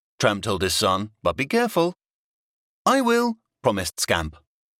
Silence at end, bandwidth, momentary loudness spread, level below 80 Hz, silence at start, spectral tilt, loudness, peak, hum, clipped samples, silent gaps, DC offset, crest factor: 0.5 s; 17 kHz; 6 LU; -48 dBFS; 0.2 s; -4 dB/octave; -23 LUFS; -6 dBFS; none; under 0.1%; 2.10-2.85 s; under 0.1%; 18 dB